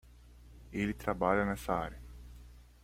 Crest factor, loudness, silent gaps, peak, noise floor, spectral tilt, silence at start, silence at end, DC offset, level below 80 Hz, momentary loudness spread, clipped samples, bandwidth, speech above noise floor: 22 dB; -34 LUFS; none; -14 dBFS; -56 dBFS; -6.5 dB/octave; 0.05 s; 0.2 s; under 0.1%; -50 dBFS; 23 LU; under 0.1%; 16.5 kHz; 23 dB